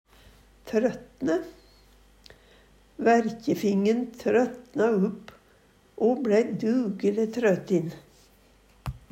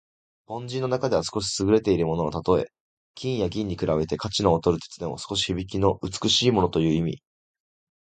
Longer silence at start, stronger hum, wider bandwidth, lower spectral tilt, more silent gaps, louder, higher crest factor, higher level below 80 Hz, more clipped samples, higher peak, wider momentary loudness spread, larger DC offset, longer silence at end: first, 0.65 s vs 0.5 s; neither; first, 16 kHz vs 9.4 kHz; first, -7 dB/octave vs -5 dB/octave; second, none vs 2.80-3.14 s; about the same, -26 LUFS vs -24 LUFS; second, 16 dB vs 22 dB; second, -56 dBFS vs -46 dBFS; neither; second, -10 dBFS vs -4 dBFS; about the same, 10 LU vs 11 LU; neither; second, 0.15 s vs 0.95 s